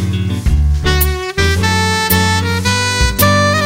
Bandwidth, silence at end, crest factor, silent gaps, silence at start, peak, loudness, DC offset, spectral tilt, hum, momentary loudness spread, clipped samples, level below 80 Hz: 16.5 kHz; 0 s; 12 dB; none; 0 s; 0 dBFS; -13 LUFS; under 0.1%; -4 dB/octave; none; 5 LU; under 0.1%; -20 dBFS